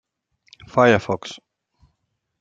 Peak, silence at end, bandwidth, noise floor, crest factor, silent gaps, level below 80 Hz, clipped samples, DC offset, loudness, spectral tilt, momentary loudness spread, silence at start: -2 dBFS; 1.05 s; 7.8 kHz; -74 dBFS; 22 dB; none; -58 dBFS; under 0.1%; under 0.1%; -19 LUFS; -6 dB/octave; 21 LU; 0.75 s